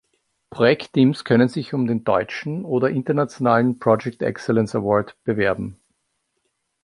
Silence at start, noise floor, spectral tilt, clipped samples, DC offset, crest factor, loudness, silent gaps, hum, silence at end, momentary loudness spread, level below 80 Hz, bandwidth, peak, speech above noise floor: 0.55 s; -73 dBFS; -7.5 dB/octave; under 0.1%; under 0.1%; 18 dB; -20 LUFS; none; none; 1.1 s; 8 LU; -56 dBFS; 11 kHz; -2 dBFS; 53 dB